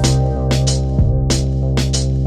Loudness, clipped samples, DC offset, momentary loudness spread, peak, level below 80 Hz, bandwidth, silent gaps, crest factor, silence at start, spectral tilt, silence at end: -17 LUFS; under 0.1%; under 0.1%; 2 LU; -2 dBFS; -20 dBFS; 13 kHz; none; 12 dB; 0 s; -5.5 dB/octave; 0 s